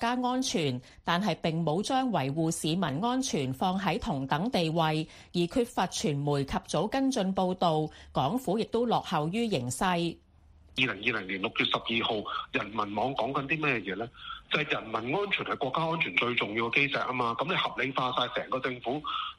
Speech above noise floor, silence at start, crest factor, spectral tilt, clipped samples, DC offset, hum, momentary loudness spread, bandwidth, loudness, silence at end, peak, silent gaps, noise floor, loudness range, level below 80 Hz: 28 dB; 0 s; 20 dB; -4.5 dB/octave; under 0.1%; under 0.1%; none; 5 LU; 15 kHz; -30 LUFS; 0.05 s; -8 dBFS; none; -57 dBFS; 2 LU; -56 dBFS